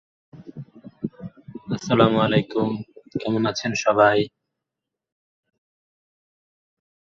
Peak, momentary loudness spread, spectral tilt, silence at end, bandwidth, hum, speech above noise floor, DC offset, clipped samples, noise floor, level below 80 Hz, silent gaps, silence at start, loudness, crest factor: -2 dBFS; 23 LU; -5.5 dB/octave; 2.8 s; 7.6 kHz; none; 65 dB; under 0.1%; under 0.1%; -85 dBFS; -58 dBFS; none; 0.35 s; -21 LUFS; 22 dB